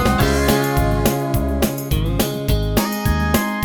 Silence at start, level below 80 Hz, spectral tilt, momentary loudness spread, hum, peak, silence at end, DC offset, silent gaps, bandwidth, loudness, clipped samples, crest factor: 0 s; -24 dBFS; -5.5 dB/octave; 4 LU; none; -2 dBFS; 0 s; under 0.1%; none; over 20 kHz; -19 LUFS; under 0.1%; 16 dB